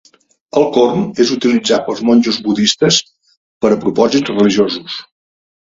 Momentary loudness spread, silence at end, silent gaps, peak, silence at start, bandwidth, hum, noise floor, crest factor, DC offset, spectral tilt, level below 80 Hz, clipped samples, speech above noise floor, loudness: 6 LU; 0.65 s; 3.37-3.61 s; 0 dBFS; 0.55 s; 7.8 kHz; none; -37 dBFS; 14 dB; under 0.1%; -4.5 dB/octave; -52 dBFS; under 0.1%; 25 dB; -13 LUFS